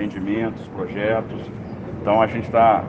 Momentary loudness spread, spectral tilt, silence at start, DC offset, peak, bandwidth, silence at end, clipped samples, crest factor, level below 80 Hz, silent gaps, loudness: 15 LU; -8.5 dB/octave; 0 s; under 0.1%; -2 dBFS; 7.2 kHz; 0 s; under 0.1%; 18 dB; -48 dBFS; none; -22 LUFS